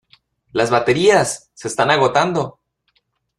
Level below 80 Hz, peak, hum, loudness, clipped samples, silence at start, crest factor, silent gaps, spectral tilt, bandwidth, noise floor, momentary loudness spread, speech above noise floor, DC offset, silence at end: -54 dBFS; -2 dBFS; none; -17 LUFS; under 0.1%; 0.55 s; 16 dB; none; -4 dB/octave; 13 kHz; -66 dBFS; 12 LU; 50 dB; under 0.1%; 0.9 s